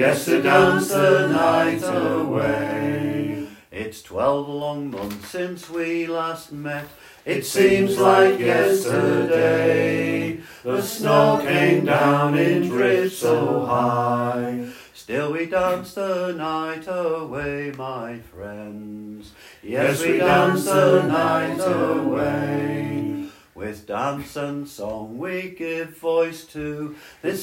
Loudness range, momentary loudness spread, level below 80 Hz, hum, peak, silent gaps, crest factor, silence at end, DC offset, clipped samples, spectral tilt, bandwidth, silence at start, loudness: 9 LU; 16 LU; -56 dBFS; none; -2 dBFS; none; 20 dB; 0 s; under 0.1%; under 0.1%; -5.5 dB/octave; 16.5 kHz; 0 s; -21 LUFS